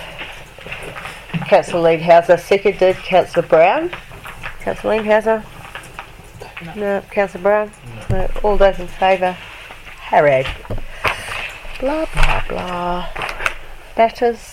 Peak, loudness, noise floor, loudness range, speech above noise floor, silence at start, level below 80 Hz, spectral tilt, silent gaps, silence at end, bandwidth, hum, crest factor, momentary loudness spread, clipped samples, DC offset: 0 dBFS; -17 LUFS; -36 dBFS; 7 LU; 21 dB; 0 s; -28 dBFS; -5.5 dB/octave; none; 0 s; 15 kHz; none; 18 dB; 20 LU; under 0.1%; under 0.1%